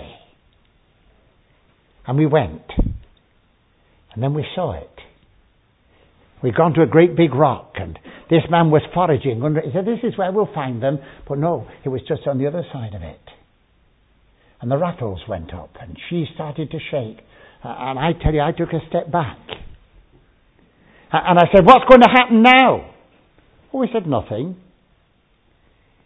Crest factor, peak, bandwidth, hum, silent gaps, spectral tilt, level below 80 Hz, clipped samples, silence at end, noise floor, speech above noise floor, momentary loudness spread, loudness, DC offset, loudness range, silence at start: 18 dB; 0 dBFS; 8 kHz; none; none; -8 dB/octave; -38 dBFS; under 0.1%; 1.5 s; -59 dBFS; 43 dB; 22 LU; -17 LUFS; under 0.1%; 15 LU; 0 s